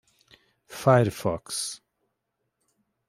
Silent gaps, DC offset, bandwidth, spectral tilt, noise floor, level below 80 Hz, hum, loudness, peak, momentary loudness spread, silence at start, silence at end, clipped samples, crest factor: none; under 0.1%; 16 kHz; -5 dB/octave; -80 dBFS; -62 dBFS; none; -25 LUFS; -6 dBFS; 20 LU; 0.7 s; 1.3 s; under 0.1%; 24 dB